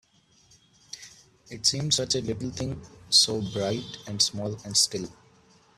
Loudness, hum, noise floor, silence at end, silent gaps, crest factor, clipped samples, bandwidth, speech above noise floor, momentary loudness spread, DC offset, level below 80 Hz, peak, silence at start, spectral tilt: -25 LUFS; none; -61 dBFS; 0.65 s; none; 24 dB; under 0.1%; 15.5 kHz; 34 dB; 22 LU; under 0.1%; -58 dBFS; -6 dBFS; 0.95 s; -2.5 dB/octave